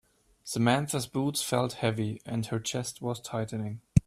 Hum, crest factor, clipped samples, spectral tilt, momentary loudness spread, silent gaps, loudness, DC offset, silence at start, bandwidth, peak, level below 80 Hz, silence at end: none; 24 dB; under 0.1%; -5 dB/octave; 9 LU; none; -31 LUFS; under 0.1%; 0.45 s; 15 kHz; -6 dBFS; -50 dBFS; 0.05 s